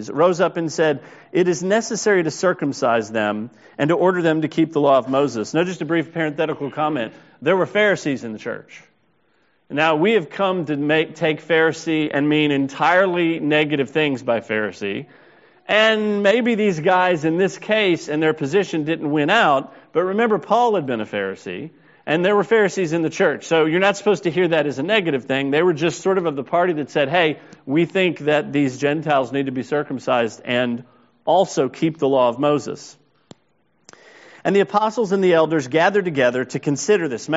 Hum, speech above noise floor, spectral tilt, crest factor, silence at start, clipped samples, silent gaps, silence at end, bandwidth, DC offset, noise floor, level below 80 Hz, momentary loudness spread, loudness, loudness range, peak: none; 46 dB; -4 dB/octave; 18 dB; 0 s; under 0.1%; none; 0 s; 8 kHz; under 0.1%; -64 dBFS; -66 dBFS; 8 LU; -19 LUFS; 3 LU; 0 dBFS